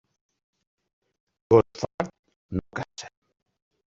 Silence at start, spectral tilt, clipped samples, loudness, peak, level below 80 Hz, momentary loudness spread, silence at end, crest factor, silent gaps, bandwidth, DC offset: 1.5 s; -6.5 dB/octave; under 0.1%; -26 LUFS; -4 dBFS; -56 dBFS; 19 LU; 0.85 s; 26 dB; 1.94-1.98 s, 2.19-2.23 s, 2.36-2.49 s; 7.8 kHz; under 0.1%